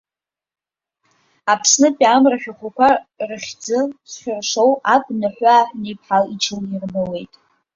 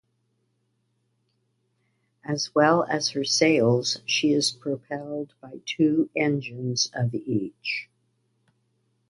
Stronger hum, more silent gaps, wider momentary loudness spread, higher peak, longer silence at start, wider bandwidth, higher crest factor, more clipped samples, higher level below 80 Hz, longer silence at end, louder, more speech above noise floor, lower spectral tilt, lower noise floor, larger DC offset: neither; neither; about the same, 14 LU vs 13 LU; about the same, -2 dBFS vs -4 dBFS; second, 1.45 s vs 2.25 s; second, 7.8 kHz vs 11.5 kHz; about the same, 18 dB vs 22 dB; neither; first, -60 dBFS vs -68 dBFS; second, 0.5 s vs 1.25 s; first, -17 LUFS vs -24 LUFS; first, 72 dB vs 48 dB; about the same, -3 dB/octave vs -4 dB/octave; first, -89 dBFS vs -73 dBFS; neither